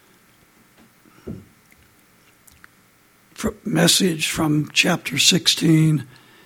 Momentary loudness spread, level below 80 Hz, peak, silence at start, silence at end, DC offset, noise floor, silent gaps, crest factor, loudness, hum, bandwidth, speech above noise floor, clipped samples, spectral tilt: 21 LU; -52 dBFS; -2 dBFS; 1.25 s; 0.4 s; under 0.1%; -56 dBFS; none; 20 dB; -18 LUFS; none; 17 kHz; 37 dB; under 0.1%; -3.5 dB/octave